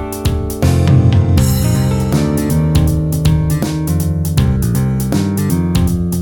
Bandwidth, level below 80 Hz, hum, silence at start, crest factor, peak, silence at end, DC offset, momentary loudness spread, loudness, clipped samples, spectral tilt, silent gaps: 19.5 kHz; -22 dBFS; none; 0 s; 12 dB; 0 dBFS; 0 s; under 0.1%; 5 LU; -14 LUFS; under 0.1%; -6.5 dB/octave; none